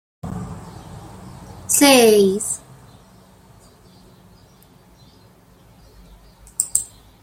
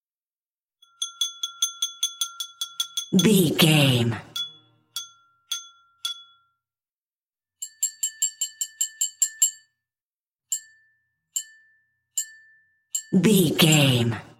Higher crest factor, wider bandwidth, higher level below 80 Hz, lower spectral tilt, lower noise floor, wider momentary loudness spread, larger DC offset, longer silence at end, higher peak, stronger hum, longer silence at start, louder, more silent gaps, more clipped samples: about the same, 22 dB vs 22 dB; about the same, 16.5 kHz vs 16.5 kHz; first, -50 dBFS vs -66 dBFS; about the same, -3 dB/octave vs -3.5 dB/octave; second, -50 dBFS vs under -90 dBFS; first, 28 LU vs 16 LU; neither; first, 0.4 s vs 0.15 s; first, 0 dBFS vs -4 dBFS; neither; second, 0.25 s vs 1 s; first, -16 LUFS vs -23 LUFS; second, none vs 6.92-7.10 s, 7.16-7.26 s, 10.01-10.26 s; neither